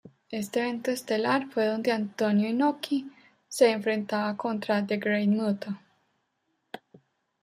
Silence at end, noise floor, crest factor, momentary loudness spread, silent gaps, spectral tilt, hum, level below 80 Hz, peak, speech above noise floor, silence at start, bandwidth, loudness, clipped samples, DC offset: 0.65 s; -76 dBFS; 20 dB; 14 LU; none; -5.5 dB/octave; none; -76 dBFS; -8 dBFS; 50 dB; 0.05 s; 15.5 kHz; -27 LUFS; under 0.1%; under 0.1%